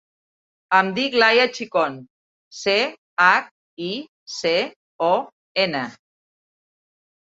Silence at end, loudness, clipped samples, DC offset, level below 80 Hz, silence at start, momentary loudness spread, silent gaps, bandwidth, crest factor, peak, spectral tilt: 1.3 s; -20 LUFS; under 0.1%; under 0.1%; -70 dBFS; 0.7 s; 16 LU; 2.10-2.51 s, 2.98-3.17 s, 3.51-3.77 s, 4.08-4.26 s, 4.76-4.99 s, 5.33-5.55 s; 7.8 kHz; 22 dB; -2 dBFS; -3.5 dB/octave